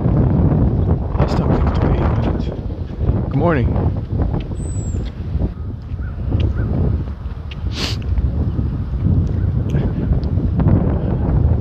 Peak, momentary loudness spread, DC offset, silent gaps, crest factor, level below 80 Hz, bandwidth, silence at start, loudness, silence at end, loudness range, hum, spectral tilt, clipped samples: -2 dBFS; 9 LU; under 0.1%; none; 16 dB; -22 dBFS; 8.6 kHz; 0 s; -19 LUFS; 0 s; 4 LU; none; -8 dB/octave; under 0.1%